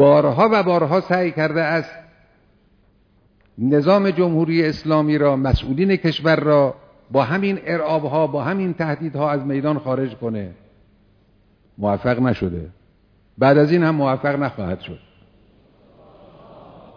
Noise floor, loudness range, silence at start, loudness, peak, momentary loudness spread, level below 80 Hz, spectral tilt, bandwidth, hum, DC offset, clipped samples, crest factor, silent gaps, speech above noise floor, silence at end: -57 dBFS; 6 LU; 0 s; -19 LUFS; -2 dBFS; 12 LU; -42 dBFS; -8.5 dB/octave; 5.4 kHz; none; under 0.1%; under 0.1%; 18 dB; none; 39 dB; 0.35 s